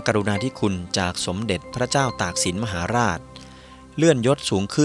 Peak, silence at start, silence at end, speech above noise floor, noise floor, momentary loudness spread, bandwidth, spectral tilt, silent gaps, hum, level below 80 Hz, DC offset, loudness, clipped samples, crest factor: -2 dBFS; 0 s; 0 s; 22 dB; -44 dBFS; 7 LU; 13.5 kHz; -4.5 dB/octave; none; none; -48 dBFS; under 0.1%; -22 LUFS; under 0.1%; 20 dB